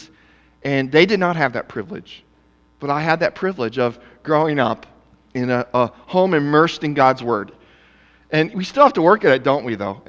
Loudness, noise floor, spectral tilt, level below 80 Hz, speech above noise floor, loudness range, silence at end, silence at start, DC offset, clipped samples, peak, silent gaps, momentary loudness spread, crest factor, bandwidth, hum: -18 LUFS; -56 dBFS; -6.5 dB/octave; -56 dBFS; 38 dB; 4 LU; 0.1 s; 0 s; under 0.1%; under 0.1%; 0 dBFS; none; 15 LU; 18 dB; 7.8 kHz; none